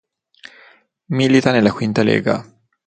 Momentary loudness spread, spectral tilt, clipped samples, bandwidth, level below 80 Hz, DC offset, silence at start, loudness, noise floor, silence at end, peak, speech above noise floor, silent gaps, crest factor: 10 LU; -6.5 dB/octave; under 0.1%; 9.2 kHz; -54 dBFS; under 0.1%; 1.1 s; -16 LUFS; -50 dBFS; 0.45 s; 0 dBFS; 35 dB; none; 18 dB